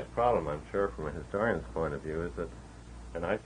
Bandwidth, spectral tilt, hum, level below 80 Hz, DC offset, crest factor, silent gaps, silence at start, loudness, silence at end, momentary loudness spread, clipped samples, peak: 10 kHz; -7 dB/octave; none; -48 dBFS; under 0.1%; 20 dB; none; 0 s; -33 LUFS; 0 s; 15 LU; under 0.1%; -14 dBFS